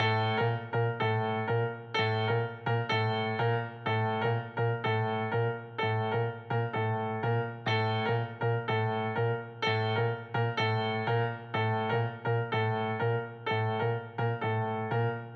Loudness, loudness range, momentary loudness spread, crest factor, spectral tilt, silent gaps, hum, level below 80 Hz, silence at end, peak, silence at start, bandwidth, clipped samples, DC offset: -31 LUFS; 1 LU; 3 LU; 14 dB; -7.5 dB/octave; none; none; -76 dBFS; 0 s; -16 dBFS; 0 s; 6.2 kHz; under 0.1%; under 0.1%